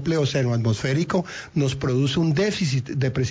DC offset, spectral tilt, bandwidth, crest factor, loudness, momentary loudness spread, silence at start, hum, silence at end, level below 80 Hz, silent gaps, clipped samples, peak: under 0.1%; -6 dB/octave; 7.8 kHz; 12 dB; -23 LUFS; 4 LU; 0 s; none; 0 s; -48 dBFS; none; under 0.1%; -10 dBFS